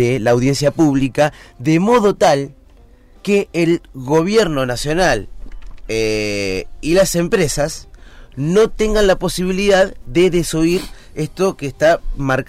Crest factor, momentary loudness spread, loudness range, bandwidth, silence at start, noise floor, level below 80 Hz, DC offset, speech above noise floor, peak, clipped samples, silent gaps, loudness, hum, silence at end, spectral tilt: 12 dB; 9 LU; 2 LU; 16 kHz; 0 s; -45 dBFS; -32 dBFS; under 0.1%; 29 dB; -4 dBFS; under 0.1%; none; -16 LUFS; none; 0.05 s; -5 dB/octave